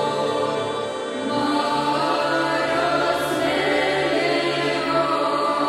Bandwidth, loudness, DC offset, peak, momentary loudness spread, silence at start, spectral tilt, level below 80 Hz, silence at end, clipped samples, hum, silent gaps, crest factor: 16 kHz; -21 LUFS; under 0.1%; -8 dBFS; 5 LU; 0 s; -4 dB/octave; -56 dBFS; 0 s; under 0.1%; none; none; 14 dB